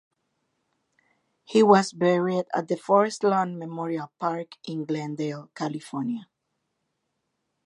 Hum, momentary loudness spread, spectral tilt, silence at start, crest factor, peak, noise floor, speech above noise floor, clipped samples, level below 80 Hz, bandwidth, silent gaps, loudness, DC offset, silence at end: none; 14 LU; -6 dB/octave; 1.5 s; 22 dB; -4 dBFS; -79 dBFS; 54 dB; under 0.1%; -78 dBFS; 11.5 kHz; none; -25 LUFS; under 0.1%; 1.4 s